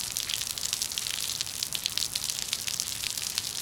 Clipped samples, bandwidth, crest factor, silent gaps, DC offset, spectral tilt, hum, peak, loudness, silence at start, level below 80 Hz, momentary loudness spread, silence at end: under 0.1%; 18 kHz; 28 dB; none; under 0.1%; 1 dB/octave; none; -4 dBFS; -29 LUFS; 0 s; -58 dBFS; 2 LU; 0 s